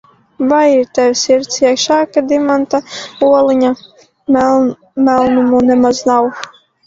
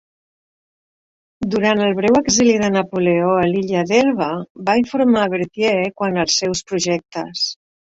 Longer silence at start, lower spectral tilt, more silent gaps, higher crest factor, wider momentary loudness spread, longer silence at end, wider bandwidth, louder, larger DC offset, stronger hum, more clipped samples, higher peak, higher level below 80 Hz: second, 0.4 s vs 1.4 s; about the same, -3.5 dB/octave vs -4 dB/octave; second, none vs 4.50-4.55 s; about the same, 12 dB vs 16 dB; about the same, 9 LU vs 8 LU; about the same, 0.4 s vs 0.3 s; about the same, 7.8 kHz vs 8 kHz; first, -12 LUFS vs -17 LUFS; neither; neither; neither; about the same, 0 dBFS vs -2 dBFS; about the same, -50 dBFS vs -52 dBFS